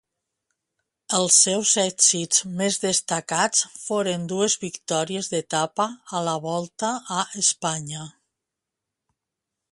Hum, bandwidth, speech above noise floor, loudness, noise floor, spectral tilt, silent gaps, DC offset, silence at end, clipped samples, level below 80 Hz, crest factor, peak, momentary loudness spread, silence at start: none; 11.5 kHz; 61 dB; -22 LUFS; -85 dBFS; -2 dB/octave; none; under 0.1%; 1.6 s; under 0.1%; -70 dBFS; 22 dB; -4 dBFS; 11 LU; 1.1 s